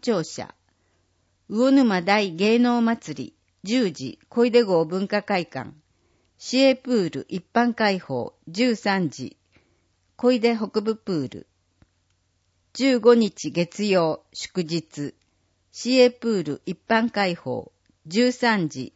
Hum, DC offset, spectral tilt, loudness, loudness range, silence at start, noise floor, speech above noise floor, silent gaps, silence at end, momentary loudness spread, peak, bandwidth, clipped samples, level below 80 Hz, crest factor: none; under 0.1%; -5 dB/octave; -22 LUFS; 3 LU; 0 s; -69 dBFS; 47 dB; none; 0.05 s; 17 LU; -4 dBFS; 8 kHz; under 0.1%; -68 dBFS; 18 dB